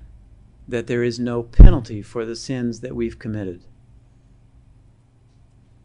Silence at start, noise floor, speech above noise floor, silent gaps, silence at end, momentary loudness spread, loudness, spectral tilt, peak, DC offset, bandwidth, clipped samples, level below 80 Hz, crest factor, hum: 0.7 s; -53 dBFS; 38 dB; none; 2.3 s; 17 LU; -21 LUFS; -7.5 dB/octave; 0 dBFS; under 0.1%; 8.4 kHz; 0.4%; -20 dBFS; 18 dB; none